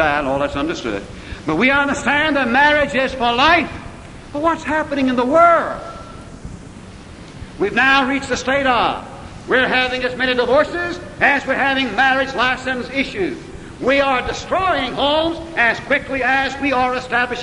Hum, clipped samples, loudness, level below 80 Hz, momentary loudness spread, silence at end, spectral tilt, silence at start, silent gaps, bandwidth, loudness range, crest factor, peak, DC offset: none; under 0.1%; -17 LUFS; -40 dBFS; 21 LU; 0 s; -4 dB/octave; 0 s; none; 11 kHz; 3 LU; 18 dB; 0 dBFS; under 0.1%